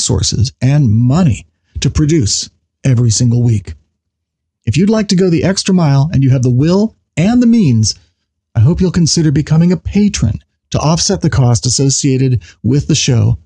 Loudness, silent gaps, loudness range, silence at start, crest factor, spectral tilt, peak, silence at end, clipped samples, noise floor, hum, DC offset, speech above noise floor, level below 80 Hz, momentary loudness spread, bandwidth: -12 LUFS; none; 3 LU; 0 s; 8 dB; -5.5 dB/octave; -2 dBFS; 0.1 s; under 0.1%; -74 dBFS; none; under 0.1%; 63 dB; -32 dBFS; 7 LU; 10.5 kHz